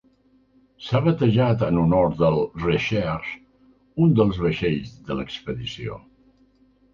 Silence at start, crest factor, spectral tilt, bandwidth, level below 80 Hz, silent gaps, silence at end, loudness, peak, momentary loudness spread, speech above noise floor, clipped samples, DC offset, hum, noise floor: 0.8 s; 18 dB; -8 dB/octave; 7.2 kHz; -44 dBFS; none; 0.95 s; -22 LUFS; -6 dBFS; 15 LU; 38 dB; under 0.1%; under 0.1%; none; -59 dBFS